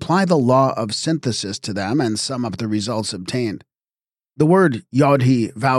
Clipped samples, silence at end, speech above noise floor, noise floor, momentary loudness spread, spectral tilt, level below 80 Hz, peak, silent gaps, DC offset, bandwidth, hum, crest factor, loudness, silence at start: under 0.1%; 0 s; over 72 dB; under -90 dBFS; 9 LU; -5.5 dB/octave; -58 dBFS; -4 dBFS; none; under 0.1%; 12.5 kHz; none; 16 dB; -19 LUFS; 0 s